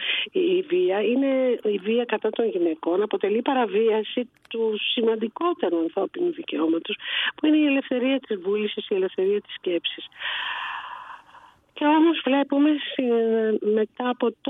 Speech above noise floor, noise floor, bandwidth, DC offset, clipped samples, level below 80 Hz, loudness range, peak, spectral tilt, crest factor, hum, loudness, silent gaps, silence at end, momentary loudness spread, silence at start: 28 dB; -52 dBFS; 4 kHz; under 0.1%; under 0.1%; -76 dBFS; 3 LU; -6 dBFS; -7.5 dB/octave; 16 dB; none; -24 LUFS; none; 0 s; 7 LU; 0 s